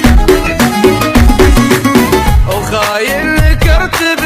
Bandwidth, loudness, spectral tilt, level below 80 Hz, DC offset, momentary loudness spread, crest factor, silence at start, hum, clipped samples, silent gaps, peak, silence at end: 16.5 kHz; -9 LUFS; -5 dB/octave; -12 dBFS; under 0.1%; 5 LU; 8 dB; 0 s; none; 0.4%; none; 0 dBFS; 0 s